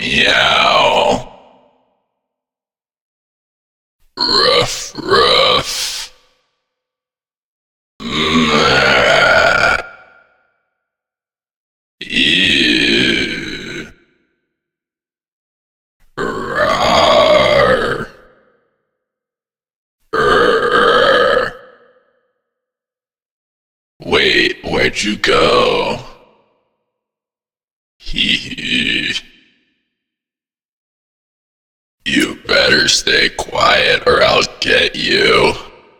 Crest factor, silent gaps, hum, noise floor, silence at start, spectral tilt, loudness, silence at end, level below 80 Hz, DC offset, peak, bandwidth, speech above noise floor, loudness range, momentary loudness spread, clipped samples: 16 dB; 3.01-3.99 s, 7.44-7.99 s, 11.56-11.98 s, 15.32-16.00 s, 19.76-19.99 s, 23.31-24.00 s, 27.64-28.00 s, 30.65-31.98 s; none; under -90 dBFS; 0 s; -3 dB/octave; -12 LUFS; 0.3 s; -38 dBFS; under 0.1%; 0 dBFS; 19 kHz; over 77 dB; 8 LU; 13 LU; under 0.1%